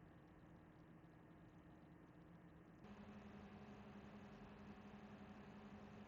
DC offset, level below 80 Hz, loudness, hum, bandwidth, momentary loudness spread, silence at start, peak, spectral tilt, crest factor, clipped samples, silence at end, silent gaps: under 0.1%; -76 dBFS; -62 LUFS; none; 7.2 kHz; 6 LU; 0 s; -48 dBFS; -6 dB/octave; 14 dB; under 0.1%; 0 s; none